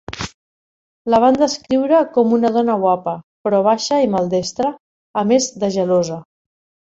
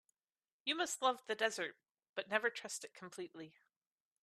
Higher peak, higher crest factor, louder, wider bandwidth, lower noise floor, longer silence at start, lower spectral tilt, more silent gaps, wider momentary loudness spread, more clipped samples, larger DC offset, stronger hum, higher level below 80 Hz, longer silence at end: first, -2 dBFS vs -18 dBFS; second, 16 dB vs 26 dB; first, -17 LUFS vs -40 LUFS; second, 8 kHz vs 14 kHz; about the same, under -90 dBFS vs under -90 dBFS; second, 0.1 s vs 0.65 s; first, -5 dB/octave vs -1 dB/octave; first, 0.34-1.05 s, 3.23-3.44 s, 4.80-5.14 s vs 2.09-2.14 s; about the same, 12 LU vs 14 LU; neither; neither; neither; first, -52 dBFS vs under -90 dBFS; about the same, 0.65 s vs 0.75 s